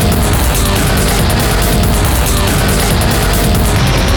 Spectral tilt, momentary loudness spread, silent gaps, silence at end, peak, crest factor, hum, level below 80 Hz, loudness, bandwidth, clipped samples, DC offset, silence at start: -4.5 dB/octave; 0 LU; none; 0 s; -2 dBFS; 8 dB; none; -16 dBFS; -11 LUFS; over 20 kHz; under 0.1%; under 0.1%; 0 s